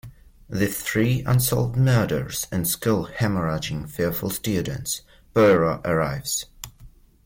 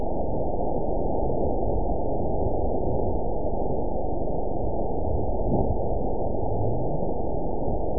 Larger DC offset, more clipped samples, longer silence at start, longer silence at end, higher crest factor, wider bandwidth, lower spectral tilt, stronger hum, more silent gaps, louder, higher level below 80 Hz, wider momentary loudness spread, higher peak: second, under 0.1% vs 6%; neither; about the same, 0.05 s vs 0 s; first, 0.4 s vs 0 s; about the same, 16 dB vs 16 dB; first, 17 kHz vs 1 kHz; second, -5 dB/octave vs -18 dB/octave; neither; neither; first, -23 LUFS vs -28 LUFS; second, -46 dBFS vs -32 dBFS; first, 10 LU vs 3 LU; about the same, -8 dBFS vs -10 dBFS